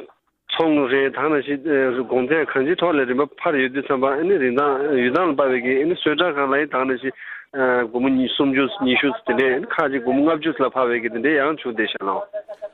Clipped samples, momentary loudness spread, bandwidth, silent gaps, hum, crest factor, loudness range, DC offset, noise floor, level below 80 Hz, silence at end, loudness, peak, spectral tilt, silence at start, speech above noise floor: under 0.1%; 5 LU; 4.4 kHz; none; none; 16 dB; 1 LU; under 0.1%; -44 dBFS; -60 dBFS; 0.05 s; -20 LUFS; -4 dBFS; -7.5 dB/octave; 0 s; 25 dB